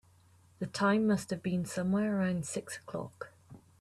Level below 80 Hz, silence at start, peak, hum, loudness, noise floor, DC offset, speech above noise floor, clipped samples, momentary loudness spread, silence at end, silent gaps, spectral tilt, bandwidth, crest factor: -70 dBFS; 0.6 s; -18 dBFS; none; -33 LUFS; -63 dBFS; under 0.1%; 31 dB; under 0.1%; 14 LU; 0.25 s; none; -6 dB/octave; 13 kHz; 16 dB